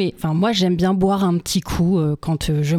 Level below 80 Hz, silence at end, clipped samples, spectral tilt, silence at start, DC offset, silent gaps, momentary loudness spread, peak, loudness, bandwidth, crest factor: -38 dBFS; 0 s; under 0.1%; -6 dB/octave; 0 s; under 0.1%; none; 4 LU; -6 dBFS; -19 LUFS; 15.5 kHz; 14 dB